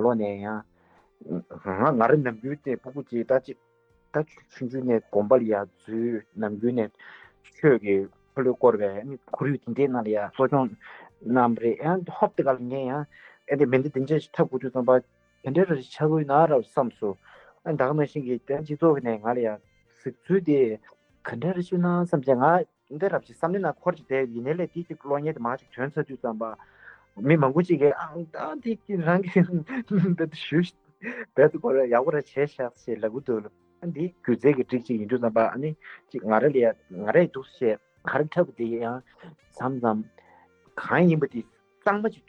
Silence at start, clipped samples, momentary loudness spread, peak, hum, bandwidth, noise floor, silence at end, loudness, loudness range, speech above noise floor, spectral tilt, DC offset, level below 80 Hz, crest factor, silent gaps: 0 s; under 0.1%; 13 LU; -6 dBFS; none; 8.2 kHz; -61 dBFS; 0.15 s; -25 LUFS; 3 LU; 36 dB; -9 dB/octave; under 0.1%; -70 dBFS; 18 dB; none